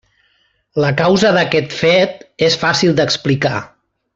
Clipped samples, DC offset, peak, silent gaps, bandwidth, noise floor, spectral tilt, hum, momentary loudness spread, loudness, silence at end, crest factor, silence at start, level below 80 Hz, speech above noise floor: under 0.1%; under 0.1%; 0 dBFS; none; 8 kHz; -60 dBFS; -5 dB/octave; none; 7 LU; -14 LUFS; 0.5 s; 14 dB; 0.75 s; -50 dBFS; 46 dB